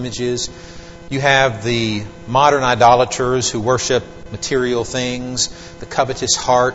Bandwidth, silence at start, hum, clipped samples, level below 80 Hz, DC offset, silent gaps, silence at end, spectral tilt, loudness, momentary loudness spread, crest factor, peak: 8.2 kHz; 0 s; none; under 0.1%; -42 dBFS; 0.7%; none; 0 s; -3.5 dB/octave; -17 LUFS; 14 LU; 18 dB; 0 dBFS